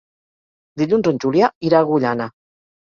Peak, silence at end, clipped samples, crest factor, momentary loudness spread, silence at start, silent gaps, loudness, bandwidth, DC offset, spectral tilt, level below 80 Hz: -2 dBFS; 0.6 s; under 0.1%; 18 dB; 11 LU; 0.75 s; 1.55-1.61 s; -18 LUFS; 7.2 kHz; under 0.1%; -7.5 dB/octave; -60 dBFS